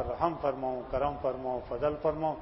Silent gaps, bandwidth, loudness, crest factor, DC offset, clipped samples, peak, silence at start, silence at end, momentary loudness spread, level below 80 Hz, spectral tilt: none; 5.8 kHz; -32 LUFS; 18 dB; under 0.1%; under 0.1%; -14 dBFS; 0 s; 0 s; 5 LU; -50 dBFS; -10.5 dB/octave